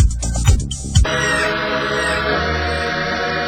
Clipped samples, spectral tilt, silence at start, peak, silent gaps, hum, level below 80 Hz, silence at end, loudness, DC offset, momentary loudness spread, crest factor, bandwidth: under 0.1%; -4 dB/octave; 0 s; 0 dBFS; none; none; -22 dBFS; 0 s; -18 LUFS; under 0.1%; 3 LU; 16 dB; 16 kHz